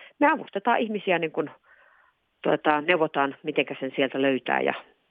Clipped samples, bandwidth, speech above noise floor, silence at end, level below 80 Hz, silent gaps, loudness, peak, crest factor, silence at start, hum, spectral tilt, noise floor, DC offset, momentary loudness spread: under 0.1%; 4.7 kHz; 39 dB; 0.3 s; -78 dBFS; none; -25 LUFS; -4 dBFS; 22 dB; 0 s; none; -8 dB/octave; -64 dBFS; under 0.1%; 7 LU